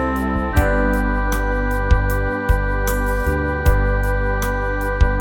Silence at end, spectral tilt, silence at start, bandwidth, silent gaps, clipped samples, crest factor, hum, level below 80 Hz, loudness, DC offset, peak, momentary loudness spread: 0 s; -6.5 dB/octave; 0 s; 19 kHz; none; under 0.1%; 16 dB; 50 Hz at -30 dBFS; -20 dBFS; -20 LUFS; under 0.1%; -2 dBFS; 3 LU